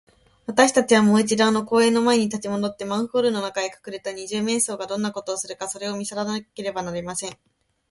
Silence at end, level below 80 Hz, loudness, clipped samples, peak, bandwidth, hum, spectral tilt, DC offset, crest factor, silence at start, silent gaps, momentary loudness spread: 0.55 s; -62 dBFS; -22 LUFS; under 0.1%; 0 dBFS; 11.5 kHz; none; -4 dB/octave; under 0.1%; 22 dB; 0.5 s; none; 13 LU